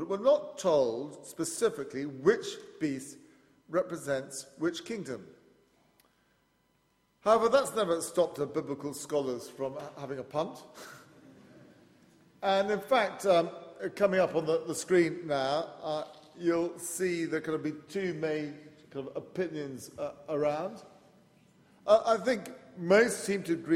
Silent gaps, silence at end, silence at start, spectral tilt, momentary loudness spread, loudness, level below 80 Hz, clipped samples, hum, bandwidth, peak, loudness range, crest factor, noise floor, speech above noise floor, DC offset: none; 0 s; 0 s; -4.5 dB/octave; 14 LU; -31 LUFS; -72 dBFS; under 0.1%; none; 16 kHz; -10 dBFS; 8 LU; 22 dB; -72 dBFS; 41 dB; under 0.1%